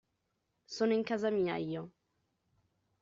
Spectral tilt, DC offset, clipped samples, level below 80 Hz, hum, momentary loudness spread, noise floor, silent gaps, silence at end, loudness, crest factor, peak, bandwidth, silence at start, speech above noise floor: -5 dB/octave; under 0.1%; under 0.1%; -76 dBFS; none; 14 LU; -82 dBFS; none; 1.1 s; -34 LUFS; 16 dB; -20 dBFS; 7.4 kHz; 0.7 s; 49 dB